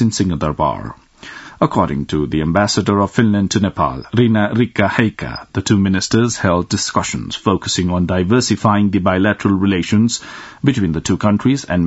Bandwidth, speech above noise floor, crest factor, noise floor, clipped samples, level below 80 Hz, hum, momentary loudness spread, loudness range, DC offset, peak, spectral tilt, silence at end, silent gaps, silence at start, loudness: 8 kHz; 20 dB; 16 dB; -36 dBFS; under 0.1%; -42 dBFS; none; 7 LU; 1 LU; under 0.1%; 0 dBFS; -5.5 dB/octave; 0 s; none; 0 s; -16 LUFS